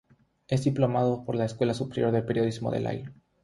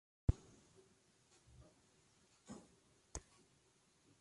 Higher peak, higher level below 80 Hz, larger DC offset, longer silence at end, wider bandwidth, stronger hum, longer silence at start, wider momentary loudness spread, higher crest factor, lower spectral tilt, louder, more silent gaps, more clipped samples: first, -10 dBFS vs -20 dBFS; second, -58 dBFS vs -52 dBFS; neither; second, 0.3 s vs 1 s; about the same, 11.5 kHz vs 11.5 kHz; neither; first, 0.5 s vs 0.3 s; second, 7 LU vs 28 LU; second, 18 dB vs 30 dB; about the same, -7.5 dB/octave vs -6.5 dB/octave; first, -28 LUFS vs -47 LUFS; neither; neither